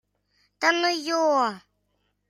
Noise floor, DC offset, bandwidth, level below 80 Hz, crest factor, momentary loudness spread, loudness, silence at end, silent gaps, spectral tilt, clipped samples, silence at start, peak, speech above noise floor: -73 dBFS; under 0.1%; 14 kHz; -78 dBFS; 20 dB; 6 LU; -23 LUFS; 0.7 s; none; -2 dB/octave; under 0.1%; 0.6 s; -6 dBFS; 50 dB